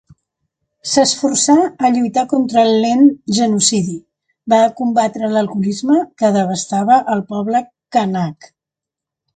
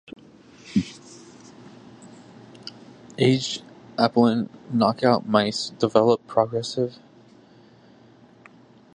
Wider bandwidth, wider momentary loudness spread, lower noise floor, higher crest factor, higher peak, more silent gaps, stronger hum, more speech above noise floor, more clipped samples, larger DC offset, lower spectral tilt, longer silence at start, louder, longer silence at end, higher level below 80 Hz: about the same, 9.4 kHz vs 10 kHz; second, 7 LU vs 21 LU; first, -85 dBFS vs -52 dBFS; second, 16 dB vs 24 dB; about the same, 0 dBFS vs -2 dBFS; neither; neither; first, 71 dB vs 30 dB; neither; neither; second, -4 dB/octave vs -6 dB/octave; first, 0.85 s vs 0.65 s; first, -15 LUFS vs -22 LUFS; second, 1 s vs 2.05 s; about the same, -60 dBFS vs -62 dBFS